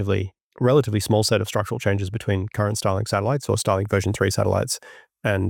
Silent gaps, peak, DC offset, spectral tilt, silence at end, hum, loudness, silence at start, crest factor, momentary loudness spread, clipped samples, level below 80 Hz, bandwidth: 0.43-0.51 s; -6 dBFS; under 0.1%; -5.5 dB/octave; 0 s; none; -22 LUFS; 0 s; 16 dB; 6 LU; under 0.1%; -54 dBFS; 17 kHz